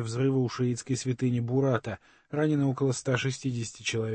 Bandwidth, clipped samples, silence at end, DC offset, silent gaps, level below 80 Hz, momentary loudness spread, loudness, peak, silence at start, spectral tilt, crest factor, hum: 8.8 kHz; under 0.1%; 0 s; under 0.1%; none; -64 dBFS; 6 LU; -29 LUFS; -12 dBFS; 0 s; -6 dB/octave; 18 dB; none